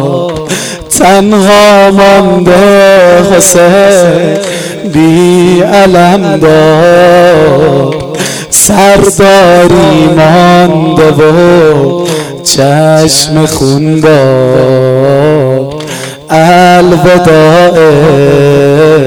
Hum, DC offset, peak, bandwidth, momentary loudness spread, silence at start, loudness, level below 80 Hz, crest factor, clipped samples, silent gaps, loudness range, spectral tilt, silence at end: none; 1%; 0 dBFS; over 20 kHz; 9 LU; 0 s; -4 LUFS; -32 dBFS; 4 dB; 8%; none; 3 LU; -5 dB/octave; 0 s